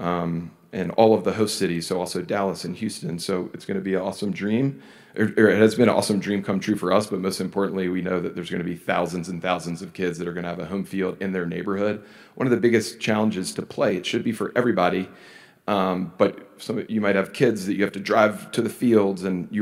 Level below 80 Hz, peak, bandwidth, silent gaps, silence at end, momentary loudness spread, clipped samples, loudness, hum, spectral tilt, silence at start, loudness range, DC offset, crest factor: -64 dBFS; -2 dBFS; 16 kHz; none; 0 s; 10 LU; under 0.1%; -24 LUFS; none; -5.5 dB/octave; 0 s; 6 LU; under 0.1%; 22 dB